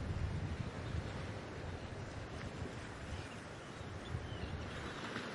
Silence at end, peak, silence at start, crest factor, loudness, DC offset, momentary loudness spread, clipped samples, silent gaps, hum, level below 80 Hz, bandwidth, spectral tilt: 0 s; -26 dBFS; 0 s; 18 dB; -45 LUFS; under 0.1%; 6 LU; under 0.1%; none; none; -52 dBFS; 11.5 kHz; -6 dB/octave